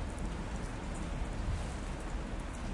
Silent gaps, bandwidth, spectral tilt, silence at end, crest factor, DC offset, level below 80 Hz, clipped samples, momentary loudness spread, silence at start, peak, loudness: none; 11.5 kHz; -5.5 dB/octave; 0 s; 12 dB; under 0.1%; -40 dBFS; under 0.1%; 3 LU; 0 s; -26 dBFS; -41 LUFS